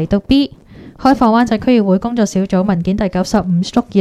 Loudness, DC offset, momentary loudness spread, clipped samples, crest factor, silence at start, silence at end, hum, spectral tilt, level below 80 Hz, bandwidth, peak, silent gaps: -14 LUFS; under 0.1%; 5 LU; under 0.1%; 14 dB; 0 s; 0 s; none; -6.5 dB/octave; -36 dBFS; 12.5 kHz; 0 dBFS; none